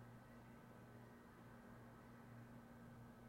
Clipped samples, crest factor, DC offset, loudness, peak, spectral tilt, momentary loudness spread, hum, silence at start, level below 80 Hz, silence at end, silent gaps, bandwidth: under 0.1%; 12 dB; under 0.1%; -62 LUFS; -48 dBFS; -7 dB/octave; 2 LU; none; 0 s; -76 dBFS; 0 s; none; 16 kHz